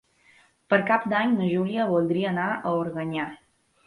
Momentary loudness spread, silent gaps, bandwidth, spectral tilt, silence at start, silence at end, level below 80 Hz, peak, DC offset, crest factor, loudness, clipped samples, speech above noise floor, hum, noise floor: 8 LU; none; 11 kHz; -8 dB/octave; 0.7 s; 0.5 s; -68 dBFS; -6 dBFS; under 0.1%; 18 dB; -25 LUFS; under 0.1%; 35 dB; none; -59 dBFS